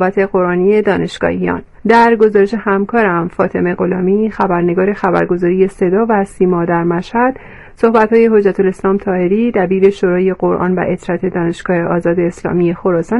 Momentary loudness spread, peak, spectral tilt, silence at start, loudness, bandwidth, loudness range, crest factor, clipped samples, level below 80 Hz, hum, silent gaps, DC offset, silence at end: 7 LU; 0 dBFS; -8 dB/octave; 0 s; -13 LUFS; 11.5 kHz; 2 LU; 12 dB; under 0.1%; -42 dBFS; none; none; under 0.1%; 0 s